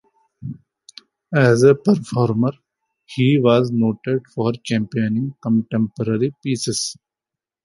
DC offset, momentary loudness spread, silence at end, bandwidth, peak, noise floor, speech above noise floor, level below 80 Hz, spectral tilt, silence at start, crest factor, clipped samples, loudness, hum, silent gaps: under 0.1%; 10 LU; 0.7 s; 11.5 kHz; -2 dBFS; -87 dBFS; 70 dB; -58 dBFS; -6 dB/octave; 0.4 s; 18 dB; under 0.1%; -19 LUFS; none; none